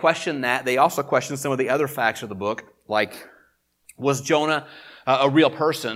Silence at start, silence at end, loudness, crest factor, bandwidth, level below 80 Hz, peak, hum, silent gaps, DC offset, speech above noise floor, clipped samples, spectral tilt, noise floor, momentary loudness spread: 0 s; 0 s; -22 LUFS; 20 dB; 16.5 kHz; -70 dBFS; -2 dBFS; none; none; under 0.1%; 41 dB; under 0.1%; -4.5 dB/octave; -63 dBFS; 10 LU